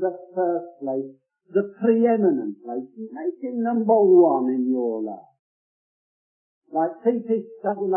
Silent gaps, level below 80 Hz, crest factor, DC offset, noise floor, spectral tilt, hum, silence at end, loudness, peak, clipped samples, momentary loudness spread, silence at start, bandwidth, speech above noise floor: 5.39-6.62 s; -82 dBFS; 18 dB; under 0.1%; under -90 dBFS; -13 dB/octave; none; 0 s; -22 LUFS; -6 dBFS; under 0.1%; 16 LU; 0 s; 3 kHz; over 68 dB